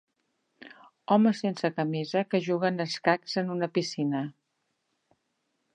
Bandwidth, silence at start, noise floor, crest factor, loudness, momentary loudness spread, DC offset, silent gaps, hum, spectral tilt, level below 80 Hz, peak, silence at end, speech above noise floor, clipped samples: 9.8 kHz; 0.6 s; -78 dBFS; 22 dB; -28 LUFS; 7 LU; under 0.1%; none; none; -6 dB/octave; -82 dBFS; -8 dBFS; 1.45 s; 51 dB; under 0.1%